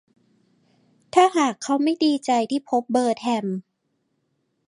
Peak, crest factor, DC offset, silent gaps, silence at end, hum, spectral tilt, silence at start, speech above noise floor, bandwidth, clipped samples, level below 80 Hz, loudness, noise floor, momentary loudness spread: -4 dBFS; 20 dB; under 0.1%; none; 1.05 s; none; -4.5 dB/octave; 1.15 s; 52 dB; 11.5 kHz; under 0.1%; -74 dBFS; -22 LUFS; -73 dBFS; 7 LU